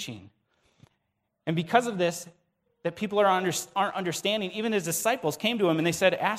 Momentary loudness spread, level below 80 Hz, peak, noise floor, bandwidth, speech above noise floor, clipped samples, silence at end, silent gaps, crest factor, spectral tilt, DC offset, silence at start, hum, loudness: 12 LU; -70 dBFS; -6 dBFS; -79 dBFS; 16 kHz; 52 dB; under 0.1%; 0 s; none; 22 dB; -4 dB/octave; under 0.1%; 0 s; none; -27 LUFS